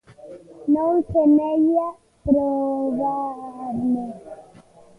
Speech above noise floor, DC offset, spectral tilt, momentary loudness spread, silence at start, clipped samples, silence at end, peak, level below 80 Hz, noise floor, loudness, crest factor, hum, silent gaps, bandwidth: 29 dB; under 0.1%; -10 dB/octave; 16 LU; 0.25 s; under 0.1%; 0.55 s; -6 dBFS; -50 dBFS; -49 dBFS; -21 LUFS; 16 dB; none; none; 3 kHz